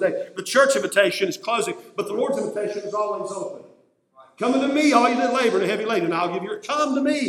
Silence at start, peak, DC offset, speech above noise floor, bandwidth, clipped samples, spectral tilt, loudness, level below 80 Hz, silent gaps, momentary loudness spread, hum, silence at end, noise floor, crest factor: 0 s; -2 dBFS; under 0.1%; 35 dB; 17 kHz; under 0.1%; -3.5 dB/octave; -22 LUFS; -76 dBFS; none; 11 LU; none; 0 s; -57 dBFS; 20 dB